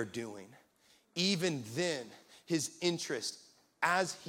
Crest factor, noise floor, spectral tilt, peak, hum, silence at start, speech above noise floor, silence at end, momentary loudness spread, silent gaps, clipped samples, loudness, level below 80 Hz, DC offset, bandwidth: 22 dB; -69 dBFS; -3.5 dB/octave; -14 dBFS; none; 0 s; 33 dB; 0 s; 19 LU; none; under 0.1%; -35 LUFS; -80 dBFS; under 0.1%; 17 kHz